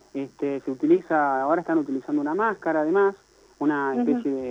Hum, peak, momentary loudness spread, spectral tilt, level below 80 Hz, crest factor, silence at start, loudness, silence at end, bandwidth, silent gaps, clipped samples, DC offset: none; -8 dBFS; 8 LU; -7.5 dB/octave; -68 dBFS; 16 dB; 0.15 s; -24 LUFS; 0 s; 7.8 kHz; none; under 0.1%; under 0.1%